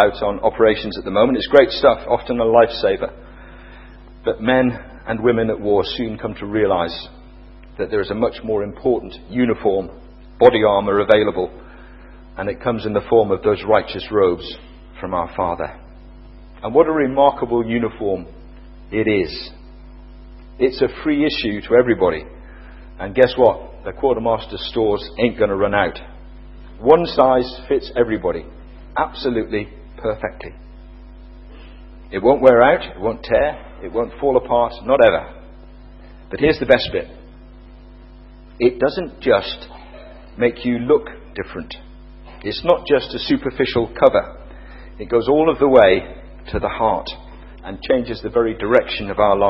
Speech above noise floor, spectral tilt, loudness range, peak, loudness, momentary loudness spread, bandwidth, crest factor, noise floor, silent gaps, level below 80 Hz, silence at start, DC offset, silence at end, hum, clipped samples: 23 dB; -8.5 dB/octave; 5 LU; 0 dBFS; -18 LUFS; 17 LU; 5.8 kHz; 18 dB; -40 dBFS; none; -40 dBFS; 0 s; under 0.1%; 0 s; none; under 0.1%